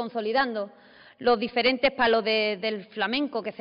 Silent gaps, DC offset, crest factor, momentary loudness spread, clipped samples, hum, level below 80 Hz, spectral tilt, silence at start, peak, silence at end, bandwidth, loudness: none; under 0.1%; 14 dB; 9 LU; under 0.1%; none; -60 dBFS; -1 dB/octave; 0 s; -12 dBFS; 0.1 s; 5.4 kHz; -25 LUFS